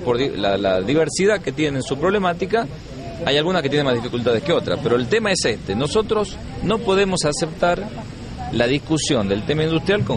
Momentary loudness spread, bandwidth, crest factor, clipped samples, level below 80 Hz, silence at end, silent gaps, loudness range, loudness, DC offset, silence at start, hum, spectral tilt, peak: 8 LU; 11.5 kHz; 16 dB; under 0.1%; -40 dBFS; 0 s; none; 1 LU; -20 LUFS; under 0.1%; 0 s; none; -5 dB/octave; -2 dBFS